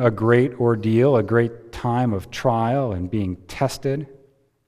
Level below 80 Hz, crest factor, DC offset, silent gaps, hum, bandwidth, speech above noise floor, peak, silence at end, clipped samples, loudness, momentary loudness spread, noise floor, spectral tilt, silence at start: -48 dBFS; 18 dB; under 0.1%; none; none; 15 kHz; 37 dB; -2 dBFS; 0.55 s; under 0.1%; -21 LUFS; 9 LU; -57 dBFS; -7.5 dB/octave; 0 s